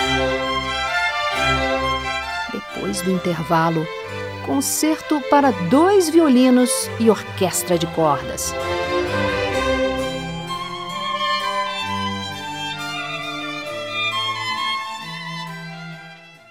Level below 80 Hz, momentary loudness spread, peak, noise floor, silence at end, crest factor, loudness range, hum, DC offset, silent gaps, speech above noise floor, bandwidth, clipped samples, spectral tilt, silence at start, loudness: -42 dBFS; 13 LU; -2 dBFS; -42 dBFS; 0.15 s; 20 dB; 8 LU; none; 0.1%; none; 24 dB; 16.5 kHz; under 0.1%; -4 dB/octave; 0 s; -20 LUFS